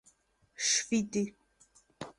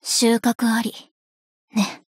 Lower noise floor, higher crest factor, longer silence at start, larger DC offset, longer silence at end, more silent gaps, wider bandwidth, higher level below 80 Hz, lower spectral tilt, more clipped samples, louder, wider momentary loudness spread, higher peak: second, -68 dBFS vs under -90 dBFS; about the same, 20 dB vs 16 dB; first, 0.6 s vs 0.05 s; neither; about the same, 0.1 s vs 0.15 s; second, none vs 1.11-1.68 s; second, 11.5 kHz vs 16 kHz; about the same, -72 dBFS vs -72 dBFS; about the same, -2 dB/octave vs -3 dB/octave; neither; second, -31 LUFS vs -21 LUFS; about the same, 11 LU vs 9 LU; second, -16 dBFS vs -6 dBFS